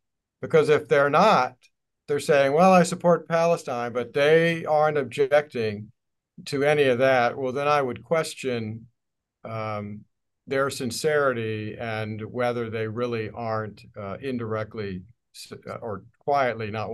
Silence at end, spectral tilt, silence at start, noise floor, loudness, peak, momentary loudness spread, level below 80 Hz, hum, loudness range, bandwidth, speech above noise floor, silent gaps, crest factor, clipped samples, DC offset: 0 s; -5.5 dB/octave; 0.4 s; -82 dBFS; -24 LUFS; -6 dBFS; 17 LU; -62 dBFS; none; 9 LU; 12.5 kHz; 58 dB; none; 20 dB; under 0.1%; under 0.1%